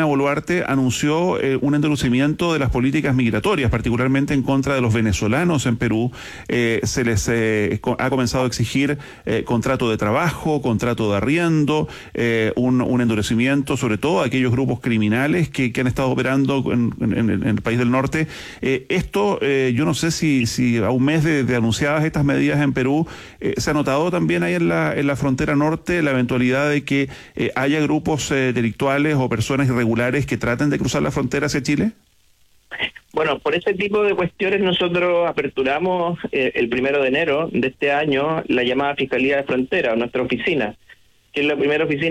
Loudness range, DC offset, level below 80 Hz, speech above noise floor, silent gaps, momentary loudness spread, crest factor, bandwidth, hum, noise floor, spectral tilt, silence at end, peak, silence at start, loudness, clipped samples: 2 LU; under 0.1%; -42 dBFS; 37 dB; none; 4 LU; 12 dB; 15 kHz; none; -56 dBFS; -6 dB/octave; 0 s; -8 dBFS; 0 s; -19 LUFS; under 0.1%